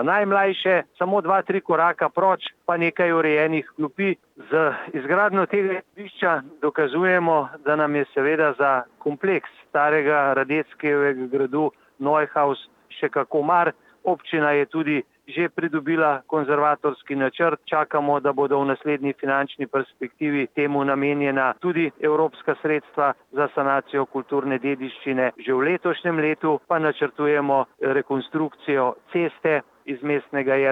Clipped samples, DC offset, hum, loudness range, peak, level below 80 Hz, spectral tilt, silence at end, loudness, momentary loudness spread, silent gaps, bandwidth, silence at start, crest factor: under 0.1%; under 0.1%; none; 2 LU; -6 dBFS; -78 dBFS; -8 dB/octave; 0 s; -22 LUFS; 7 LU; none; 4.8 kHz; 0 s; 16 dB